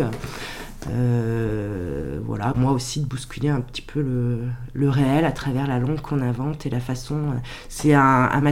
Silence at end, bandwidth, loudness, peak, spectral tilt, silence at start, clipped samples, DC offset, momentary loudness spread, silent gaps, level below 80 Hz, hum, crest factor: 0 s; 15.5 kHz; -23 LUFS; -4 dBFS; -6.5 dB/octave; 0 s; under 0.1%; under 0.1%; 11 LU; none; -40 dBFS; none; 18 dB